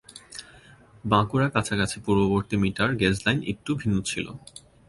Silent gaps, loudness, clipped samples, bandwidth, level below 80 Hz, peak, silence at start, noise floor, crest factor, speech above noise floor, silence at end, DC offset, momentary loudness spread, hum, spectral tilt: none; -25 LUFS; under 0.1%; 11.5 kHz; -48 dBFS; -4 dBFS; 0.15 s; -52 dBFS; 20 dB; 27 dB; 0.3 s; under 0.1%; 18 LU; none; -5.5 dB/octave